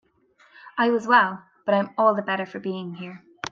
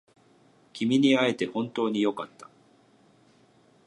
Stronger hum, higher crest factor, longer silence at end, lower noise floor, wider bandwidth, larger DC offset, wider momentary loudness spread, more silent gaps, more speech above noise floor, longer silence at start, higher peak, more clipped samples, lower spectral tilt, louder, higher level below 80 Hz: neither; about the same, 20 dB vs 20 dB; second, 0.05 s vs 1.4 s; about the same, -60 dBFS vs -61 dBFS; second, 7.6 kHz vs 11 kHz; neither; about the same, 17 LU vs 18 LU; neither; about the same, 37 dB vs 35 dB; about the same, 0.65 s vs 0.75 s; first, -4 dBFS vs -10 dBFS; neither; about the same, -5.5 dB/octave vs -5.5 dB/octave; first, -23 LUFS vs -26 LUFS; first, -72 dBFS vs -78 dBFS